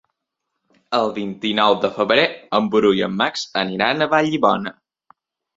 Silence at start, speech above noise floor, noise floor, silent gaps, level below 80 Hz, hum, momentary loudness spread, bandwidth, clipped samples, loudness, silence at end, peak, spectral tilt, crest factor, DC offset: 0.9 s; 60 dB; -79 dBFS; none; -60 dBFS; none; 7 LU; 7.8 kHz; under 0.1%; -19 LUFS; 0.85 s; -2 dBFS; -5 dB/octave; 18 dB; under 0.1%